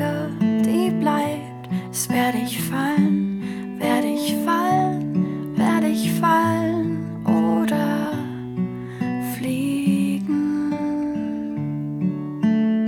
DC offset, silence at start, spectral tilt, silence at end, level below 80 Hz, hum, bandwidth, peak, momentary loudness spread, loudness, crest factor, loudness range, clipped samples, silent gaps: under 0.1%; 0 s; -6 dB/octave; 0 s; -58 dBFS; none; 18.5 kHz; -6 dBFS; 8 LU; -22 LUFS; 14 dB; 3 LU; under 0.1%; none